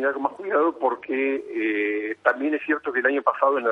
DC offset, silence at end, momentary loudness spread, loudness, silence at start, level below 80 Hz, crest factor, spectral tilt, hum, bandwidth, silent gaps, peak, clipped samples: under 0.1%; 0 s; 4 LU; -24 LUFS; 0 s; -74 dBFS; 20 dB; -6 dB/octave; none; 4.9 kHz; none; -4 dBFS; under 0.1%